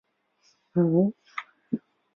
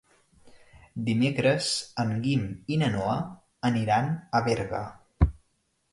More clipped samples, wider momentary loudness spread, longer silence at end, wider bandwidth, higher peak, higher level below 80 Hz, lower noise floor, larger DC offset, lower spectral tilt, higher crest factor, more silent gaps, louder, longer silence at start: neither; first, 16 LU vs 9 LU; second, 0.4 s vs 0.6 s; second, 6 kHz vs 11.5 kHz; about the same, -10 dBFS vs -8 dBFS; second, -72 dBFS vs -40 dBFS; second, -67 dBFS vs -73 dBFS; neither; first, -10 dB/octave vs -5.5 dB/octave; about the same, 18 dB vs 20 dB; neither; about the same, -27 LUFS vs -27 LUFS; first, 0.75 s vs 0.45 s